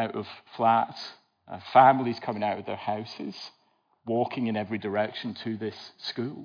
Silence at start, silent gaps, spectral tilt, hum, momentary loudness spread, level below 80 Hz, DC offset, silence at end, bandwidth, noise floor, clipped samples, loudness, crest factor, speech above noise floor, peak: 0 s; none; -7 dB/octave; none; 21 LU; -84 dBFS; under 0.1%; 0 s; 5.2 kHz; -68 dBFS; under 0.1%; -27 LUFS; 22 dB; 41 dB; -6 dBFS